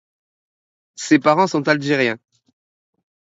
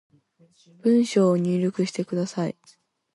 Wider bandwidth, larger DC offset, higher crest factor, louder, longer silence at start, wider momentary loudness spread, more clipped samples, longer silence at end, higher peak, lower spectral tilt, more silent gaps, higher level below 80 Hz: second, 8 kHz vs 11.5 kHz; neither; about the same, 20 dB vs 16 dB; first, -17 LUFS vs -23 LUFS; first, 1 s vs 0.85 s; first, 13 LU vs 10 LU; neither; first, 1.1 s vs 0.65 s; first, 0 dBFS vs -8 dBFS; second, -5 dB/octave vs -7 dB/octave; neither; about the same, -70 dBFS vs -72 dBFS